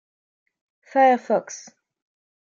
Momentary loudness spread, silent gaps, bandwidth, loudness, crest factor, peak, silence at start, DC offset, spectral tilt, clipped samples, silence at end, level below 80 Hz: 20 LU; none; 7.4 kHz; -20 LUFS; 18 dB; -6 dBFS; 0.95 s; under 0.1%; -4 dB/octave; under 0.1%; 0.95 s; -88 dBFS